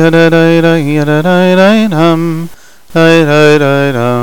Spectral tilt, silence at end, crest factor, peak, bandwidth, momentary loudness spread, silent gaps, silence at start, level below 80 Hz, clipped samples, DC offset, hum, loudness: -6.5 dB/octave; 0 s; 8 dB; 0 dBFS; 18 kHz; 8 LU; none; 0 s; -48 dBFS; under 0.1%; 5%; none; -8 LUFS